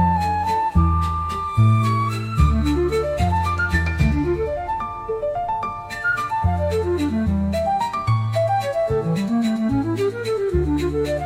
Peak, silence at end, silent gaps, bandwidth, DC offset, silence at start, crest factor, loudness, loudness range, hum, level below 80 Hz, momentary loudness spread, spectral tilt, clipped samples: -4 dBFS; 0 s; none; 15 kHz; under 0.1%; 0 s; 16 dB; -21 LUFS; 3 LU; none; -30 dBFS; 6 LU; -7.5 dB/octave; under 0.1%